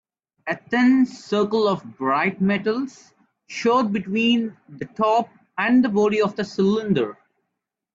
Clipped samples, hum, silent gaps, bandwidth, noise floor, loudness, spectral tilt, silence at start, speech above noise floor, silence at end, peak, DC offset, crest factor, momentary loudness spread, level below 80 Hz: under 0.1%; none; none; 7.6 kHz; -81 dBFS; -21 LUFS; -6 dB/octave; 0.45 s; 60 dB; 0.8 s; -8 dBFS; under 0.1%; 14 dB; 13 LU; -64 dBFS